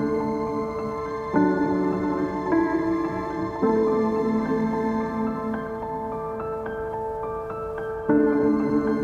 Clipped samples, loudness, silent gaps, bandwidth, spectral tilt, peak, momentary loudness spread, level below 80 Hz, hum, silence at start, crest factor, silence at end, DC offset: under 0.1%; -25 LUFS; none; 7.6 kHz; -8.5 dB/octave; -8 dBFS; 9 LU; -48 dBFS; none; 0 s; 16 dB; 0 s; under 0.1%